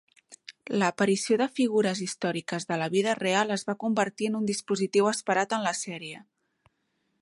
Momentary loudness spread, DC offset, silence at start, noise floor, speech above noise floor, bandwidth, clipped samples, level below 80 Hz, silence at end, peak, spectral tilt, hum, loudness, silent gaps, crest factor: 11 LU; under 0.1%; 0.3 s; -76 dBFS; 49 dB; 11.5 kHz; under 0.1%; -76 dBFS; 1 s; -10 dBFS; -4 dB/octave; none; -27 LUFS; none; 18 dB